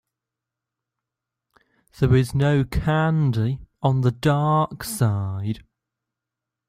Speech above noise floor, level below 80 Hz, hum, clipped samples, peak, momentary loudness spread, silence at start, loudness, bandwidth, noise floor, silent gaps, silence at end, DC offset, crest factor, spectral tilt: 66 dB; -42 dBFS; none; under 0.1%; -6 dBFS; 8 LU; 2 s; -22 LUFS; 15.5 kHz; -86 dBFS; none; 1.1 s; under 0.1%; 18 dB; -7 dB/octave